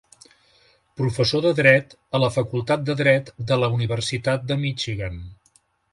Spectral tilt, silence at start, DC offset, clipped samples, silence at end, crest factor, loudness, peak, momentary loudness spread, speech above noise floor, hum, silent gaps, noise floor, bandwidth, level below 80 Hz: -5.5 dB/octave; 1 s; under 0.1%; under 0.1%; 0.6 s; 22 dB; -21 LUFS; -2 dBFS; 11 LU; 40 dB; none; none; -62 dBFS; 11.5 kHz; -48 dBFS